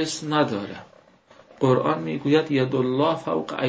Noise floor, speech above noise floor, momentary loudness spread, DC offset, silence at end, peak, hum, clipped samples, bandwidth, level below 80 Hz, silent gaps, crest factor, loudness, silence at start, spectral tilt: -53 dBFS; 31 dB; 8 LU; under 0.1%; 0 s; -6 dBFS; none; under 0.1%; 8 kHz; -64 dBFS; none; 18 dB; -23 LUFS; 0 s; -6 dB/octave